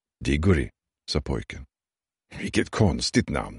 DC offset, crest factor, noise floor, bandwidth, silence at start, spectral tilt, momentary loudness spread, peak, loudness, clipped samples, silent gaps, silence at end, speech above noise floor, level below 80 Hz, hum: under 0.1%; 20 dB; under -90 dBFS; 11.5 kHz; 0.2 s; -5.5 dB/octave; 18 LU; -6 dBFS; -25 LUFS; under 0.1%; none; 0 s; over 65 dB; -38 dBFS; none